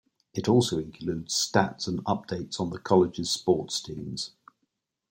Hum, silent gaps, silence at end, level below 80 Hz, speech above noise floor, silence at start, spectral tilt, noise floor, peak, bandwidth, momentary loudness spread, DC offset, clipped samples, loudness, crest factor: none; none; 0.85 s; -60 dBFS; 52 dB; 0.35 s; -4.5 dB/octave; -79 dBFS; -6 dBFS; 16.5 kHz; 11 LU; under 0.1%; under 0.1%; -27 LUFS; 22 dB